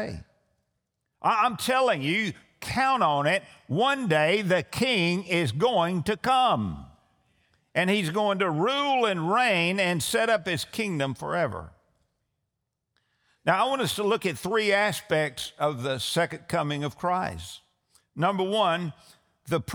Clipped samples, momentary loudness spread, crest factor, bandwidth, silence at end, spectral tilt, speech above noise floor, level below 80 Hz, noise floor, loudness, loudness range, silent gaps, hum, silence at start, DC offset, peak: under 0.1%; 8 LU; 18 dB; over 20 kHz; 0 s; -4.5 dB/octave; 56 dB; -60 dBFS; -82 dBFS; -25 LUFS; 5 LU; none; none; 0 s; under 0.1%; -10 dBFS